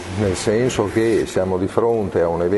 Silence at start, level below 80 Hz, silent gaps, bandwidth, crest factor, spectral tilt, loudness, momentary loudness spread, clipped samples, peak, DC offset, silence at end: 0 s; -44 dBFS; none; 11.5 kHz; 18 dB; -6 dB/octave; -19 LUFS; 2 LU; under 0.1%; -2 dBFS; under 0.1%; 0 s